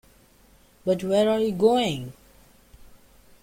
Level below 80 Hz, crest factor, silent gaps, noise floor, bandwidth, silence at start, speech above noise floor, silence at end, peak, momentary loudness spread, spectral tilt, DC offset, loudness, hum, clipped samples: -56 dBFS; 18 dB; none; -56 dBFS; 16.5 kHz; 0.85 s; 34 dB; 1.3 s; -8 dBFS; 13 LU; -6 dB/octave; under 0.1%; -23 LUFS; none; under 0.1%